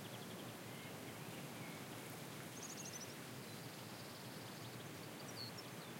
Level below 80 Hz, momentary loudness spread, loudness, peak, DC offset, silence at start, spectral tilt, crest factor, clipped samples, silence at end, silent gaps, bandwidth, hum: -84 dBFS; 3 LU; -50 LUFS; -38 dBFS; under 0.1%; 0 s; -3.5 dB/octave; 14 dB; under 0.1%; 0 s; none; 16.5 kHz; none